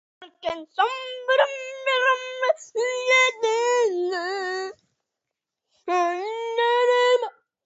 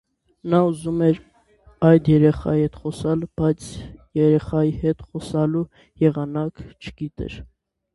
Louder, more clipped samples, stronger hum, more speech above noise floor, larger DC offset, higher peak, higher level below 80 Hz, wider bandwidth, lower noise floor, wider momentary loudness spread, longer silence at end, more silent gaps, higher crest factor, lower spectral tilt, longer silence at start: about the same, -23 LUFS vs -21 LUFS; neither; neither; first, 61 dB vs 34 dB; neither; second, -6 dBFS vs -2 dBFS; second, -74 dBFS vs -44 dBFS; second, 8 kHz vs 11.5 kHz; first, -85 dBFS vs -54 dBFS; second, 12 LU vs 17 LU; second, 0.35 s vs 0.5 s; neither; about the same, 18 dB vs 20 dB; second, -0.5 dB/octave vs -8.5 dB/octave; second, 0.2 s vs 0.45 s